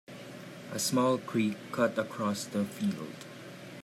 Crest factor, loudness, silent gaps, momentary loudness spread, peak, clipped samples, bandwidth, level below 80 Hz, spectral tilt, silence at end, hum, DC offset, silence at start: 18 dB; -31 LUFS; none; 17 LU; -14 dBFS; under 0.1%; 15.5 kHz; -78 dBFS; -4.5 dB/octave; 0 s; none; under 0.1%; 0.1 s